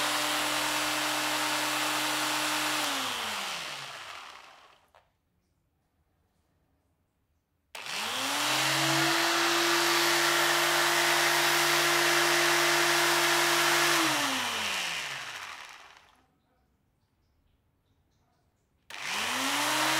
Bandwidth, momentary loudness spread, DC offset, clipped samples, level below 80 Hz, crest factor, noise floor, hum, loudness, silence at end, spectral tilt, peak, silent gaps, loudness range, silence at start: 16 kHz; 13 LU; under 0.1%; under 0.1%; -74 dBFS; 18 dB; -75 dBFS; none; -26 LUFS; 0 s; -1 dB/octave; -12 dBFS; none; 16 LU; 0 s